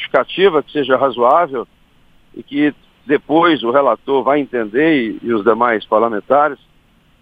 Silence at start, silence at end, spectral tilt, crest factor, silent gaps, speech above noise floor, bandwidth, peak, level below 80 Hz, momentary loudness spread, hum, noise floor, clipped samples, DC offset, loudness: 0 s; 0.65 s; -7.5 dB/octave; 16 dB; none; 38 dB; 5 kHz; 0 dBFS; -54 dBFS; 6 LU; none; -52 dBFS; under 0.1%; under 0.1%; -15 LUFS